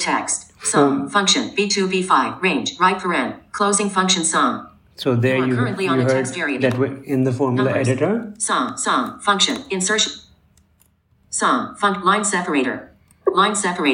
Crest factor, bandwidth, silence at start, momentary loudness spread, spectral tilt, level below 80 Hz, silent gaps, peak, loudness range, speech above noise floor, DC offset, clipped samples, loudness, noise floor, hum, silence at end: 18 dB; 16.5 kHz; 0 s; 6 LU; -3.5 dB/octave; -60 dBFS; none; -2 dBFS; 3 LU; 40 dB; under 0.1%; under 0.1%; -19 LUFS; -59 dBFS; none; 0 s